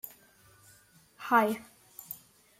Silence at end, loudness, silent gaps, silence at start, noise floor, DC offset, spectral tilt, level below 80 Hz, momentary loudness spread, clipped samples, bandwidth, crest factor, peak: 0.45 s; -28 LUFS; none; 0.05 s; -61 dBFS; under 0.1%; -4.5 dB/octave; -76 dBFS; 23 LU; under 0.1%; 16.5 kHz; 24 dB; -10 dBFS